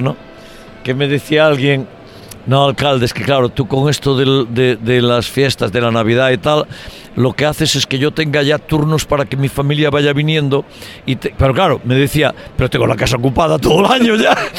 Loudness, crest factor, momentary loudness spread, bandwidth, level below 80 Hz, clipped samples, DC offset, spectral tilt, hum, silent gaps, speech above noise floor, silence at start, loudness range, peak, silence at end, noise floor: -14 LUFS; 14 dB; 9 LU; 17 kHz; -36 dBFS; under 0.1%; under 0.1%; -5.5 dB/octave; none; none; 22 dB; 0 s; 2 LU; 0 dBFS; 0 s; -35 dBFS